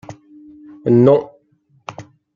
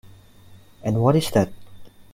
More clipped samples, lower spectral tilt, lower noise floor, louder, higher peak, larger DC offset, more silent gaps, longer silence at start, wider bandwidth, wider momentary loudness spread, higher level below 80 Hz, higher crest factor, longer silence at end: neither; first, -9.5 dB/octave vs -6.5 dB/octave; first, -58 dBFS vs -47 dBFS; first, -14 LUFS vs -21 LUFS; about the same, -2 dBFS vs -4 dBFS; neither; neither; about the same, 0.1 s vs 0.05 s; second, 7.2 kHz vs 16.5 kHz; first, 25 LU vs 10 LU; second, -58 dBFS vs -50 dBFS; about the same, 16 dB vs 20 dB; first, 0.35 s vs 0.1 s